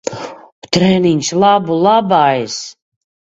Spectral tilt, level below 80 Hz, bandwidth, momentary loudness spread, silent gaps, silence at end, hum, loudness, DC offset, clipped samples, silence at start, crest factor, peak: -5 dB/octave; -50 dBFS; 8 kHz; 15 LU; 0.52-0.62 s; 0.55 s; none; -13 LUFS; under 0.1%; under 0.1%; 0.05 s; 14 dB; 0 dBFS